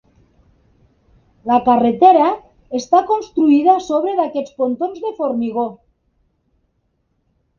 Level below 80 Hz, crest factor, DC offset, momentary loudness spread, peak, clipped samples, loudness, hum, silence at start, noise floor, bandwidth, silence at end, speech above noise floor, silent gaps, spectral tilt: -58 dBFS; 18 dB; under 0.1%; 13 LU; 0 dBFS; under 0.1%; -16 LUFS; none; 1.45 s; -66 dBFS; 7.2 kHz; 1.85 s; 51 dB; none; -6 dB/octave